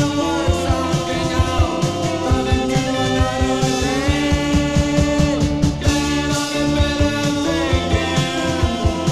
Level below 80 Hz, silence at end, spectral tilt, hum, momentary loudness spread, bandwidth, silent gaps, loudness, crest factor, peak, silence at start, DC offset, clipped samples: -26 dBFS; 0 s; -5 dB/octave; none; 2 LU; 14 kHz; none; -18 LUFS; 14 dB; -2 dBFS; 0 s; under 0.1%; under 0.1%